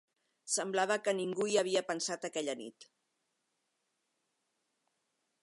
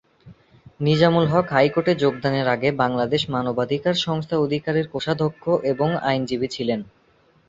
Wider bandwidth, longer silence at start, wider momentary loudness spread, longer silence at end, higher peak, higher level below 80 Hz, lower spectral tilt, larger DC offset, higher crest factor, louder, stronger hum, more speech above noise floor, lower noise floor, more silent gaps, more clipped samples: first, 11.5 kHz vs 7.8 kHz; first, 0.45 s vs 0.25 s; first, 11 LU vs 6 LU; first, 2.6 s vs 0.65 s; second, -18 dBFS vs -2 dBFS; second, under -90 dBFS vs -56 dBFS; second, -2.5 dB/octave vs -6.5 dB/octave; neither; about the same, 20 dB vs 20 dB; second, -34 LUFS vs -21 LUFS; neither; first, 48 dB vs 38 dB; first, -83 dBFS vs -59 dBFS; neither; neither